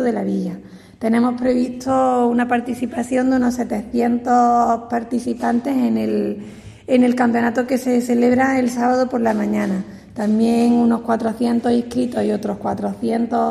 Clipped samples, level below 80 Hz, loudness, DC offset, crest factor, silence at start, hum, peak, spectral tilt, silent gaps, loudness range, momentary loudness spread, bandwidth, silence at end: under 0.1%; -52 dBFS; -18 LUFS; under 0.1%; 14 dB; 0 s; none; -4 dBFS; -6.5 dB/octave; none; 1 LU; 8 LU; 13 kHz; 0 s